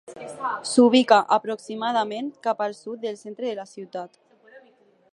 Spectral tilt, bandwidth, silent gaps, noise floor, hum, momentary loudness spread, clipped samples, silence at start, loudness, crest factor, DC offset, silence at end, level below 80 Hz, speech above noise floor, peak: -3.5 dB/octave; 11 kHz; none; -58 dBFS; none; 19 LU; under 0.1%; 0.1 s; -23 LUFS; 22 dB; under 0.1%; 0.55 s; -80 dBFS; 35 dB; -2 dBFS